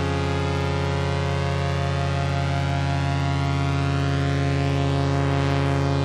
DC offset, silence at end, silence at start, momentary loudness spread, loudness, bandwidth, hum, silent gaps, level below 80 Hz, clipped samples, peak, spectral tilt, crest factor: under 0.1%; 0 s; 0 s; 2 LU; -23 LUFS; 10 kHz; none; none; -38 dBFS; under 0.1%; -12 dBFS; -6.5 dB/octave; 10 dB